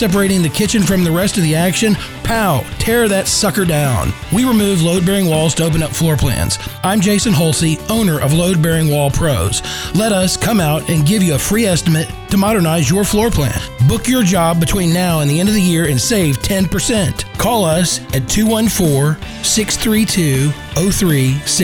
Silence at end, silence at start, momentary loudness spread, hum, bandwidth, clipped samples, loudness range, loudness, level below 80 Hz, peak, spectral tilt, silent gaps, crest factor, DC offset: 0 s; 0 s; 4 LU; none; 19.5 kHz; under 0.1%; 1 LU; -14 LUFS; -30 dBFS; -2 dBFS; -4.5 dB/octave; none; 12 dB; 0.1%